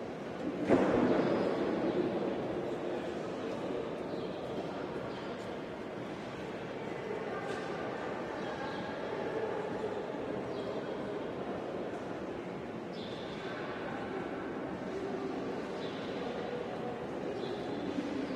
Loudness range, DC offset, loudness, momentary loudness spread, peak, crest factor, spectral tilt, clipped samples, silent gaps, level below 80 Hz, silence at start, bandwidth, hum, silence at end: 7 LU; under 0.1%; -37 LUFS; 9 LU; -14 dBFS; 22 dB; -6.5 dB/octave; under 0.1%; none; -64 dBFS; 0 s; 11.5 kHz; none; 0 s